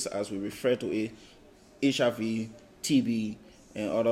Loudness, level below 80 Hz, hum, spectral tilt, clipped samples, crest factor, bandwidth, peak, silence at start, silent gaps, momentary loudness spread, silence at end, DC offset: -30 LUFS; -64 dBFS; none; -5 dB/octave; under 0.1%; 16 dB; 16 kHz; -14 dBFS; 0 s; none; 11 LU; 0 s; under 0.1%